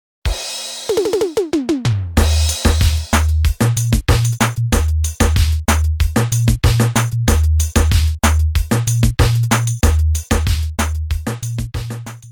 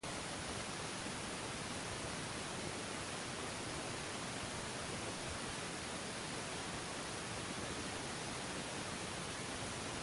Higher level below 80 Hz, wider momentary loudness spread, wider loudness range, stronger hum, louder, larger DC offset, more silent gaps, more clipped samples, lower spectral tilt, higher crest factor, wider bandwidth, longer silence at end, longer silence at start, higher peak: first, -20 dBFS vs -60 dBFS; first, 8 LU vs 0 LU; about the same, 2 LU vs 0 LU; neither; first, -17 LUFS vs -43 LUFS; neither; neither; neither; first, -5 dB/octave vs -3 dB/octave; about the same, 14 dB vs 16 dB; first, over 20 kHz vs 11.5 kHz; about the same, 0 s vs 0 s; first, 0.25 s vs 0.05 s; first, -2 dBFS vs -28 dBFS